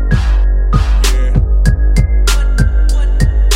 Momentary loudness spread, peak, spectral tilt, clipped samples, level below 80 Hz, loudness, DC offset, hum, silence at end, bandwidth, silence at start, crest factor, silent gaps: 2 LU; 0 dBFS; -5 dB/octave; under 0.1%; -10 dBFS; -13 LUFS; under 0.1%; none; 0 s; 13.5 kHz; 0 s; 10 dB; none